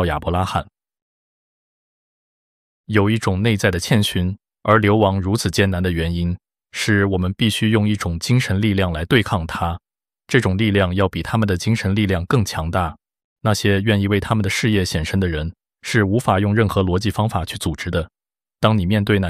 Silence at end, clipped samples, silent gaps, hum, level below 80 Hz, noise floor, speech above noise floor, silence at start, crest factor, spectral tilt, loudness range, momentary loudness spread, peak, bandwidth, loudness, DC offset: 0 s; under 0.1%; 1.02-2.84 s, 13.24-13.36 s; none; -38 dBFS; under -90 dBFS; over 72 dB; 0 s; 18 dB; -6 dB/octave; 3 LU; 8 LU; -2 dBFS; 15 kHz; -19 LUFS; under 0.1%